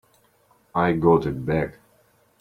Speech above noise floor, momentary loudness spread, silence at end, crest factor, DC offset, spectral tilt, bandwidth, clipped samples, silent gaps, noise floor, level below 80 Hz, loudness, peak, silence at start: 40 dB; 10 LU; 0.7 s; 20 dB; under 0.1%; -9 dB/octave; 13 kHz; under 0.1%; none; -61 dBFS; -48 dBFS; -22 LUFS; -4 dBFS; 0.75 s